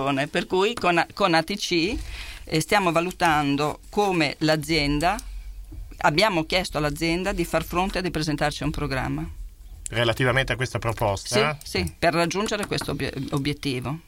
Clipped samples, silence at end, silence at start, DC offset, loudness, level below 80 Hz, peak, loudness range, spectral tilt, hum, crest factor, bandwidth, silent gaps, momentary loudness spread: under 0.1%; 0.05 s; 0 s; under 0.1%; -24 LUFS; -40 dBFS; -4 dBFS; 3 LU; -4.5 dB/octave; none; 22 dB; 17.5 kHz; none; 9 LU